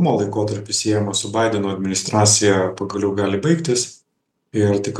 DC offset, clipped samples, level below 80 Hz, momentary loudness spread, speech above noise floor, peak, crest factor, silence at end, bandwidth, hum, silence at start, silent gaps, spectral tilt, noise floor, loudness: under 0.1%; under 0.1%; -60 dBFS; 8 LU; 54 dB; -2 dBFS; 18 dB; 0 s; 12.5 kHz; none; 0 s; none; -4 dB/octave; -73 dBFS; -19 LUFS